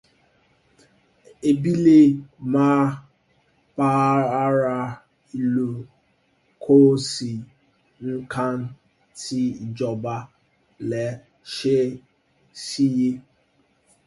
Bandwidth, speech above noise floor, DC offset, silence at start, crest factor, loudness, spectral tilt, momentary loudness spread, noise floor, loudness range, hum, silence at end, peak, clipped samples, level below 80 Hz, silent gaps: 11.5 kHz; 44 dB; under 0.1%; 1.45 s; 18 dB; -21 LUFS; -6.5 dB/octave; 20 LU; -64 dBFS; 9 LU; none; 0.85 s; -4 dBFS; under 0.1%; -62 dBFS; none